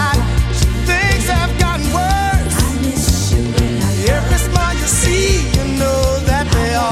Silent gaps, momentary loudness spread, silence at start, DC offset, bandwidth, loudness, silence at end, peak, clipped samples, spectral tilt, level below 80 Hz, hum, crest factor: none; 3 LU; 0 s; under 0.1%; 16 kHz; -15 LUFS; 0 s; 0 dBFS; under 0.1%; -4.5 dB/octave; -18 dBFS; none; 14 dB